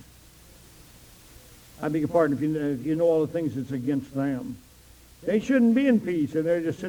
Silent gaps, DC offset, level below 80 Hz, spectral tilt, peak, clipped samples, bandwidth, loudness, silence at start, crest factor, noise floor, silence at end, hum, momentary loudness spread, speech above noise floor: none; under 0.1%; -56 dBFS; -7.5 dB/octave; -10 dBFS; under 0.1%; over 20 kHz; -25 LUFS; 1.8 s; 16 dB; -52 dBFS; 0 s; none; 11 LU; 28 dB